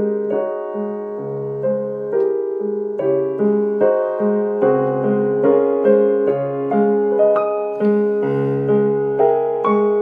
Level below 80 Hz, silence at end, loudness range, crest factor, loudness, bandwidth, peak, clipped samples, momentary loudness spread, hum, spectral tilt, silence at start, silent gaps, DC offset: -70 dBFS; 0 s; 4 LU; 14 dB; -18 LUFS; 3.6 kHz; -4 dBFS; under 0.1%; 7 LU; none; -11 dB/octave; 0 s; none; under 0.1%